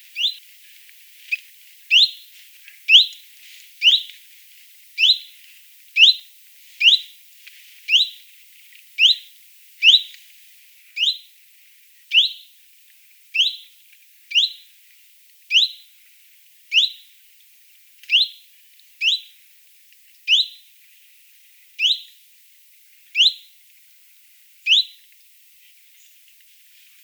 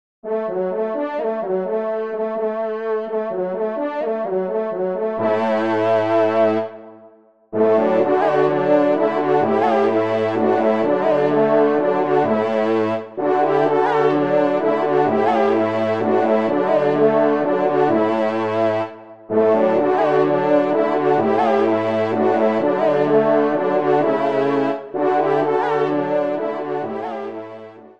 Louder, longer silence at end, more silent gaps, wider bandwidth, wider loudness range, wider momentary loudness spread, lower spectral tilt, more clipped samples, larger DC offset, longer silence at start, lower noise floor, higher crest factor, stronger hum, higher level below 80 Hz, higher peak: about the same, -16 LUFS vs -18 LUFS; first, 2.2 s vs 0.1 s; neither; first, over 20 kHz vs 7.4 kHz; about the same, 6 LU vs 5 LU; first, 20 LU vs 7 LU; second, 11.5 dB/octave vs -8 dB/octave; neither; second, under 0.1% vs 0.4%; about the same, 0.15 s vs 0.25 s; about the same, -51 dBFS vs -49 dBFS; first, 22 dB vs 14 dB; neither; second, under -90 dBFS vs -68 dBFS; first, 0 dBFS vs -4 dBFS